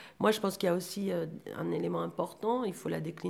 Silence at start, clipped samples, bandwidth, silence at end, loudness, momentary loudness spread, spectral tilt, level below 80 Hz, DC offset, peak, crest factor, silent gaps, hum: 0 s; under 0.1%; 18 kHz; 0 s; -33 LUFS; 7 LU; -5.5 dB/octave; -72 dBFS; under 0.1%; -14 dBFS; 20 dB; none; none